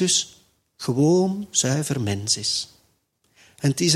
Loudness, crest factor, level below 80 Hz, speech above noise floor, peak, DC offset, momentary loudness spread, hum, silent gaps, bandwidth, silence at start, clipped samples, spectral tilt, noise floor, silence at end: -22 LUFS; 20 dB; -60 dBFS; 45 dB; -4 dBFS; under 0.1%; 10 LU; none; none; 15 kHz; 0 s; under 0.1%; -4 dB/octave; -67 dBFS; 0 s